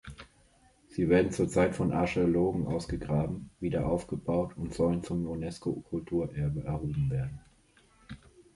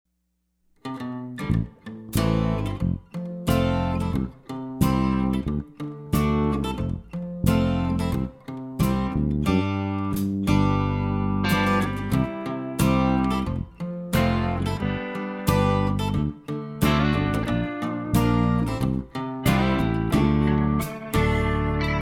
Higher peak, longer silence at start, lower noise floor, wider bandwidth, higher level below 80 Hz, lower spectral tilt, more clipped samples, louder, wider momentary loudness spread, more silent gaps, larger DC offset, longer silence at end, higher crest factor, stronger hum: second, -12 dBFS vs -6 dBFS; second, 0.05 s vs 0.85 s; second, -63 dBFS vs -73 dBFS; second, 11.5 kHz vs 18.5 kHz; second, -48 dBFS vs -34 dBFS; about the same, -7.5 dB/octave vs -7 dB/octave; neither; second, -31 LUFS vs -24 LUFS; first, 14 LU vs 11 LU; neither; neither; first, 0.15 s vs 0 s; about the same, 20 dB vs 18 dB; neither